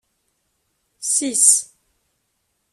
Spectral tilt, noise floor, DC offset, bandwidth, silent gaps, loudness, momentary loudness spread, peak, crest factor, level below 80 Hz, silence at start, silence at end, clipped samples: 1 dB/octave; -71 dBFS; under 0.1%; 15 kHz; none; -15 LUFS; 17 LU; 0 dBFS; 24 dB; -74 dBFS; 1 s; 1.1 s; under 0.1%